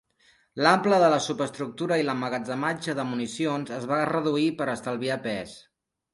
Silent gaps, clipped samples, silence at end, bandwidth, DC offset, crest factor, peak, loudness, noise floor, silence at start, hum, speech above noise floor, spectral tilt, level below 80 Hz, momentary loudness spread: none; under 0.1%; 0.55 s; 11.5 kHz; under 0.1%; 22 dB; -4 dBFS; -26 LUFS; -63 dBFS; 0.55 s; none; 38 dB; -5 dB/octave; -68 dBFS; 11 LU